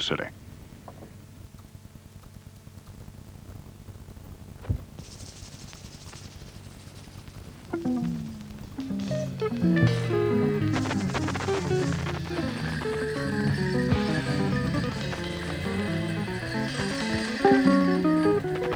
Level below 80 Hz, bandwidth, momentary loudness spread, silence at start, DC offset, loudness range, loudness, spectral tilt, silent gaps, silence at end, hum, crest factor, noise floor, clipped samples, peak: -48 dBFS; 19.5 kHz; 24 LU; 0 s; under 0.1%; 17 LU; -27 LUFS; -6.5 dB/octave; none; 0 s; none; 22 dB; -47 dBFS; under 0.1%; -6 dBFS